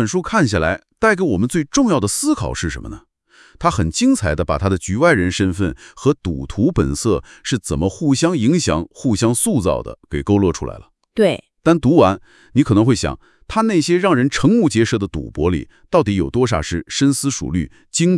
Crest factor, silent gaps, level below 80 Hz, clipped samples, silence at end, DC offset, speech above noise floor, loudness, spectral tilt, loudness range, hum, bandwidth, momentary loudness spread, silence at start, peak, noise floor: 18 dB; none; -38 dBFS; under 0.1%; 0 s; under 0.1%; 33 dB; -17 LUFS; -5.5 dB/octave; 3 LU; none; 12 kHz; 9 LU; 0 s; 0 dBFS; -49 dBFS